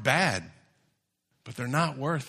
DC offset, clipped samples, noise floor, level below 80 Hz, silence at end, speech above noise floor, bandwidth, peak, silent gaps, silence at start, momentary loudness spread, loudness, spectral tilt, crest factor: under 0.1%; under 0.1%; -76 dBFS; -66 dBFS; 0 s; 48 dB; 14 kHz; -6 dBFS; none; 0 s; 13 LU; -28 LUFS; -4.5 dB/octave; 24 dB